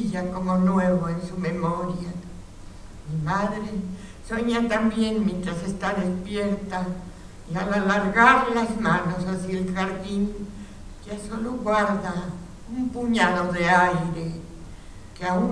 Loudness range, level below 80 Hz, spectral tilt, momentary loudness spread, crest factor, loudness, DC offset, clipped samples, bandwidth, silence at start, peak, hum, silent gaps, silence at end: 6 LU; -44 dBFS; -6 dB/octave; 19 LU; 24 dB; -24 LUFS; under 0.1%; under 0.1%; 11 kHz; 0 s; -2 dBFS; none; none; 0 s